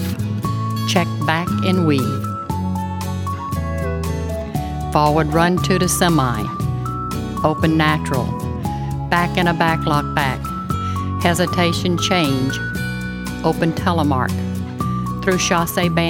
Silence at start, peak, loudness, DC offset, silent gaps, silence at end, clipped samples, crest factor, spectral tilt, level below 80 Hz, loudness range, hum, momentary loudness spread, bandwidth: 0 s; 0 dBFS; -19 LUFS; under 0.1%; none; 0 s; under 0.1%; 18 dB; -5.5 dB/octave; -34 dBFS; 3 LU; none; 8 LU; 18 kHz